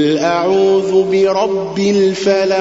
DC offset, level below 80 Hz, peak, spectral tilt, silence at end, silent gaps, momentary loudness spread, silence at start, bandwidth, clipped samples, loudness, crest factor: 0.2%; -54 dBFS; -2 dBFS; -5.5 dB/octave; 0 s; none; 4 LU; 0 s; 8 kHz; under 0.1%; -13 LUFS; 10 dB